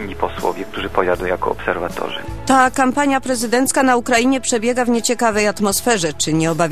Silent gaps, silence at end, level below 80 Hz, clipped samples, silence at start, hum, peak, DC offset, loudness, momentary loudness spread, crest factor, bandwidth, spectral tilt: none; 0 s; -40 dBFS; under 0.1%; 0 s; none; 0 dBFS; 2%; -17 LUFS; 9 LU; 18 dB; 15 kHz; -3.5 dB/octave